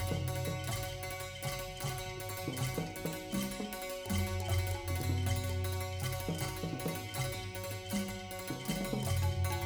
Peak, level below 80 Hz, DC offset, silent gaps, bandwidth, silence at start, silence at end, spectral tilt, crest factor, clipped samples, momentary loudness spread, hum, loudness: -22 dBFS; -50 dBFS; under 0.1%; none; over 20 kHz; 0 s; 0 s; -5 dB/octave; 14 dB; under 0.1%; 6 LU; none; -37 LUFS